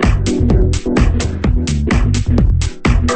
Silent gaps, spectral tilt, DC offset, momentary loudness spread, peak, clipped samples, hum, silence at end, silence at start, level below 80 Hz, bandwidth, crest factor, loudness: none; -6.5 dB/octave; under 0.1%; 3 LU; 0 dBFS; under 0.1%; none; 0 s; 0 s; -16 dBFS; 8.8 kHz; 12 dB; -15 LUFS